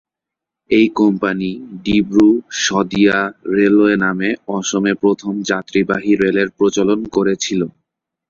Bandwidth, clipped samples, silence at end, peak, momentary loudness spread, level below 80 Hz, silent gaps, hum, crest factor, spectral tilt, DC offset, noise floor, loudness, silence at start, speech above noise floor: 7.6 kHz; under 0.1%; 0.6 s; -2 dBFS; 8 LU; -50 dBFS; none; none; 14 dB; -5 dB/octave; under 0.1%; -84 dBFS; -16 LUFS; 0.7 s; 69 dB